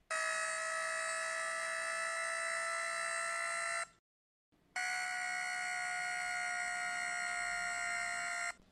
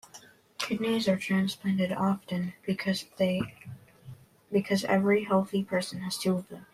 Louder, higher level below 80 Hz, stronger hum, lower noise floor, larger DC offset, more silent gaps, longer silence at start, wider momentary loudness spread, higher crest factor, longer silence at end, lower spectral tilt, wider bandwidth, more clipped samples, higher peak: second, -37 LUFS vs -29 LUFS; second, -76 dBFS vs -68 dBFS; neither; first, under -90 dBFS vs -54 dBFS; neither; first, 3.99-4.52 s vs none; about the same, 0.1 s vs 0.15 s; second, 1 LU vs 9 LU; about the same, 12 dB vs 16 dB; about the same, 0.1 s vs 0.1 s; second, 1.5 dB/octave vs -5.5 dB/octave; second, 13 kHz vs 14.5 kHz; neither; second, -26 dBFS vs -12 dBFS